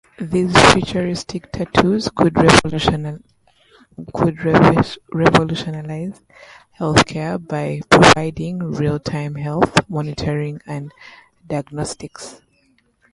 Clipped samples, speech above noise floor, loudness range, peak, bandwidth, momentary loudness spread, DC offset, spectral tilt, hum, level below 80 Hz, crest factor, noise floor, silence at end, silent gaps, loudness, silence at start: under 0.1%; 43 dB; 7 LU; 0 dBFS; 11.5 kHz; 19 LU; under 0.1%; -5 dB/octave; none; -40 dBFS; 18 dB; -60 dBFS; 0.8 s; none; -17 LUFS; 0.2 s